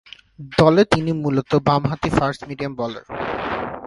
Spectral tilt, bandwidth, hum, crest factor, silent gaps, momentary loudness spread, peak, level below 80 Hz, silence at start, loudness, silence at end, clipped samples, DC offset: -7 dB/octave; 11.5 kHz; none; 20 dB; none; 13 LU; 0 dBFS; -44 dBFS; 0.4 s; -20 LUFS; 0 s; under 0.1%; under 0.1%